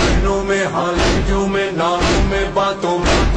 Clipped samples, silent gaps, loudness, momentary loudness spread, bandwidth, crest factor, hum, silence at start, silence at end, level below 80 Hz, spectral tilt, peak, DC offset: under 0.1%; none; -17 LUFS; 2 LU; 10 kHz; 12 dB; none; 0 s; 0 s; -22 dBFS; -5 dB/octave; -4 dBFS; under 0.1%